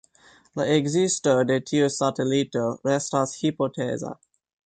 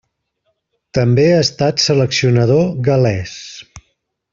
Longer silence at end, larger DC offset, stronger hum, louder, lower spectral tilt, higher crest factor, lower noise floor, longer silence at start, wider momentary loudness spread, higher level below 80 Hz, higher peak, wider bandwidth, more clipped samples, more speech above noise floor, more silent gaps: about the same, 0.6 s vs 0.55 s; neither; neither; second, -24 LUFS vs -14 LUFS; about the same, -5 dB/octave vs -5.5 dB/octave; about the same, 16 dB vs 14 dB; second, -56 dBFS vs -68 dBFS; second, 0.55 s vs 0.95 s; second, 8 LU vs 16 LU; second, -64 dBFS vs -48 dBFS; second, -8 dBFS vs -2 dBFS; first, 9.4 kHz vs 7.6 kHz; neither; second, 33 dB vs 55 dB; neither